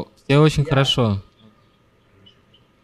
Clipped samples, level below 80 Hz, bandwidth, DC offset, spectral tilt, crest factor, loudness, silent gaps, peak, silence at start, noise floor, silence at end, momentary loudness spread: under 0.1%; -44 dBFS; 12.5 kHz; under 0.1%; -6 dB/octave; 18 dB; -18 LUFS; none; -2 dBFS; 0 s; -57 dBFS; 1.65 s; 7 LU